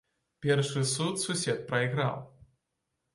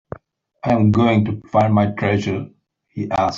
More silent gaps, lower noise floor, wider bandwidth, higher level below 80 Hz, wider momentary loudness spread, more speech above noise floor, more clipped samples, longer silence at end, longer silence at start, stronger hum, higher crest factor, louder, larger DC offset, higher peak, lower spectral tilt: neither; first, -83 dBFS vs -48 dBFS; first, 11.5 kHz vs 7.4 kHz; second, -68 dBFS vs -50 dBFS; second, 5 LU vs 21 LU; first, 53 dB vs 31 dB; neither; first, 0.85 s vs 0 s; second, 0.4 s vs 0.65 s; neither; about the same, 18 dB vs 14 dB; second, -30 LUFS vs -18 LUFS; neither; second, -14 dBFS vs -4 dBFS; second, -4.5 dB/octave vs -8 dB/octave